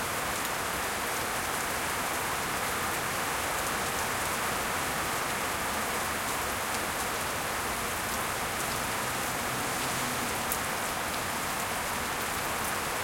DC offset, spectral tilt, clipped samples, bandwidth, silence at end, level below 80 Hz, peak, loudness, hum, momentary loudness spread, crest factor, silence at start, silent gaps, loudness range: under 0.1%; -2 dB/octave; under 0.1%; 17 kHz; 0 s; -52 dBFS; -10 dBFS; -30 LUFS; none; 1 LU; 22 dB; 0 s; none; 1 LU